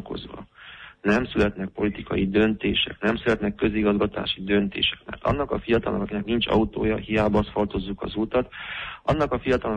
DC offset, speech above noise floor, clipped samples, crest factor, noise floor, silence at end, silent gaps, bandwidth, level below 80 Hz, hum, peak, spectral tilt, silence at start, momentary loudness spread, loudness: under 0.1%; 21 dB; under 0.1%; 16 dB; -45 dBFS; 0 s; none; 8.4 kHz; -42 dBFS; none; -10 dBFS; -7 dB/octave; 0 s; 10 LU; -24 LUFS